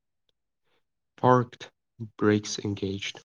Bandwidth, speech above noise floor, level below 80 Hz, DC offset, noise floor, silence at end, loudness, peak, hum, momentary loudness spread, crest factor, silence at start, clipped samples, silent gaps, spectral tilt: 10 kHz; 53 dB; -72 dBFS; under 0.1%; -80 dBFS; 0.15 s; -27 LUFS; -6 dBFS; none; 21 LU; 22 dB; 1.2 s; under 0.1%; none; -5.5 dB/octave